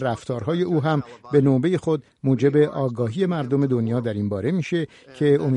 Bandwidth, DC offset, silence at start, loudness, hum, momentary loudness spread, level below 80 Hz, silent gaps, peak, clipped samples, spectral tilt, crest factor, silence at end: 10 kHz; under 0.1%; 0 s; -22 LUFS; none; 7 LU; -58 dBFS; none; -6 dBFS; under 0.1%; -8.5 dB/octave; 16 dB; 0 s